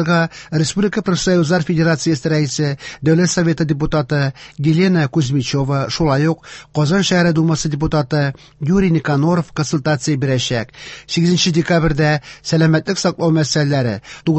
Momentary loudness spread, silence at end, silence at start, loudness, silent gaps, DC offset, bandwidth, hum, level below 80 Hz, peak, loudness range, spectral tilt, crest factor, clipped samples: 7 LU; 0 s; 0 s; -17 LUFS; none; under 0.1%; 8.4 kHz; none; -40 dBFS; -2 dBFS; 1 LU; -5.5 dB/octave; 14 dB; under 0.1%